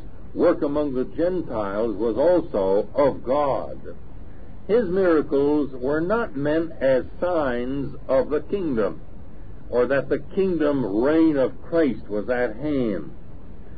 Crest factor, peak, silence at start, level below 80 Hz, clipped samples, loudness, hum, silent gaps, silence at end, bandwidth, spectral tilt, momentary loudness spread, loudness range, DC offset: 14 dB; -8 dBFS; 0 s; -44 dBFS; under 0.1%; -23 LUFS; none; none; 0 s; 4.9 kHz; -11.5 dB/octave; 9 LU; 2 LU; 3%